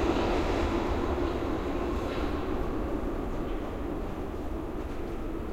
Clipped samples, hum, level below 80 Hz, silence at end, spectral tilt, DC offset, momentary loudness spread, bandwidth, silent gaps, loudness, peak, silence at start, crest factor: under 0.1%; none; -36 dBFS; 0 s; -7 dB/octave; under 0.1%; 8 LU; 16 kHz; none; -32 LUFS; -14 dBFS; 0 s; 18 dB